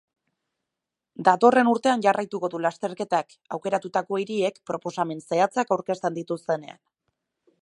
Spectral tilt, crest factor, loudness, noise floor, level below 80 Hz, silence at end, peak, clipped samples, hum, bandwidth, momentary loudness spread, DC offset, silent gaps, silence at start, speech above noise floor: -5.5 dB/octave; 22 dB; -24 LUFS; -86 dBFS; -76 dBFS; 0.95 s; -2 dBFS; under 0.1%; none; 11 kHz; 12 LU; under 0.1%; none; 1.2 s; 62 dB